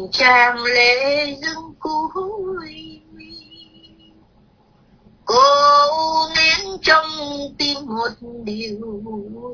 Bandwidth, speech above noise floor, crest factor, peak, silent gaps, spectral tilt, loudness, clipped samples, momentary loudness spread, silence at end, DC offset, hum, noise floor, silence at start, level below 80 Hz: 5.4 kHz; 37 dB; 18 dB; 0 dBFS; none; -2 dB/octave; -16 LUFS; under 0.1%; 19 LU; 0 s; under 0.1%; none; -54 dBFS; 0 s; -52 dBFS